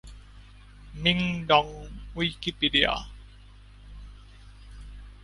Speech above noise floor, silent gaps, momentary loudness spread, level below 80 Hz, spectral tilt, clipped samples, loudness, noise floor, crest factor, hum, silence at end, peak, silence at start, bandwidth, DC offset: 24 dB; none; 26 LU; -44 dBFS; -5 dB/octave; under 0.1%; -25 LUFS; -49 dBFS; 26 dB; 50 Hz at -45 dBFS; 0 s; -6 dBFS; 0.05 s; 11.5 kHz; under 0.1%